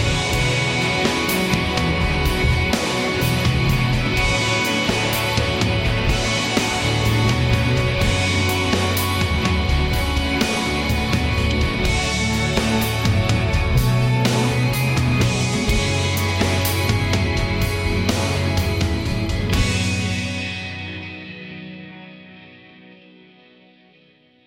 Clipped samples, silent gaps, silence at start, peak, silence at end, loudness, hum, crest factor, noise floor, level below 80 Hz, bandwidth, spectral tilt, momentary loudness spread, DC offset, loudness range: under 0.1%; none; 0 s; -6 dBFS; 1.9 s; -19 LUFS; none; 14 dB; -54 dBFS; -28 dBFS; 16.5 kHz; -4.5 dB/octave; 5 LU; under 0.1%; 6 LU